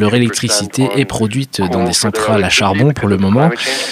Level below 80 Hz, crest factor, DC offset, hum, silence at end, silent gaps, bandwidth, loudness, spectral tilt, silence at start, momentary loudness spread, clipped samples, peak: -44 dBFS; 14 dB; under 0.1%; none; 0 s; none; 16 kHz; -13 LUFS; -4.5 dB/octave; 0 s; 5 LU; under 0.1%; 0 dBFS